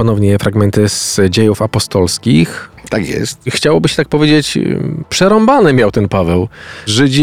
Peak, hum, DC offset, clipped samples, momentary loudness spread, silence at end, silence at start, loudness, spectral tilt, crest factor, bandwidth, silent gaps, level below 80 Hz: 0 dBFS; none; 0.8%; under 0.1%; 9 LU; 0 s; 0 s; -12 LUFS; -5 dB/octave; 12 dB; 16 kHz; none; -38 dBFS